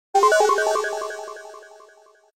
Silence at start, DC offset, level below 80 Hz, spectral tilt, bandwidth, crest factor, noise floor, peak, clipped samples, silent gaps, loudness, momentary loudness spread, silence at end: 0.15 s; under 0.1%; -72 dBFS; 0 dB/octave; 16.5 kHz; 18 dB; -53 dBFS; -4 dBFS; under 0.1%; none; -20 LUFS; 22 LU; 0.7 s